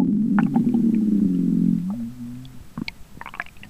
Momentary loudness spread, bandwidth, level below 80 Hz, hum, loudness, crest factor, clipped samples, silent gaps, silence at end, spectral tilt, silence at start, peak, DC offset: 17 LU; 8.4 kHz; -50 dBFS; none; -21 LUFS; 16 dB; under 0.1%; none; 0.05 s; -8.5 dB/octave; 0 s; -6 dBFS; 0.5%